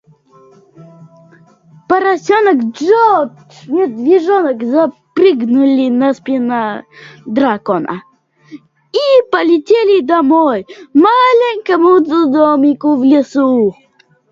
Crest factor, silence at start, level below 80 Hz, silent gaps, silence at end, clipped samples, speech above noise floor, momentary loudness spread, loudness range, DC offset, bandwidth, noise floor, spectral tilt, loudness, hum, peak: 12 dB; 0.8 s; -60 dBFS; none; 0.6 s; under 0.1%; 34 dB; 8 LU; 5 LU; under 0.1%; 7.4 kHz; -45 dBFS; -6 dB/octave; -12 LUFS; none; 0 dBFS